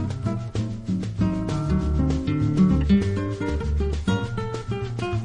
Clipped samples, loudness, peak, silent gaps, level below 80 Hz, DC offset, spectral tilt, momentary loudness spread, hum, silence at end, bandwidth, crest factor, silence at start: under 0.1%; -24 LUFS; -8 dBFS; none; -30 dBFS; under 0.1%; -8 dB/octave; 9 LU; none; 0 s; 10 kHz; 14 dB; 0 s